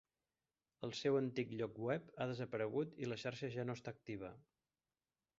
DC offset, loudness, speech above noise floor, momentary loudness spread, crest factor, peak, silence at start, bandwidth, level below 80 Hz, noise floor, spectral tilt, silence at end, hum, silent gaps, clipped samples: under 0.1%; -43 LUFS; over 47 dB; 11 LU; 20 dB; -24 dBFS; 0.8 s; 7.6 kHz; -78 dBFS; under -90 dBFS; -5.5 dB/octave; 1 s; none; none; under 0.1%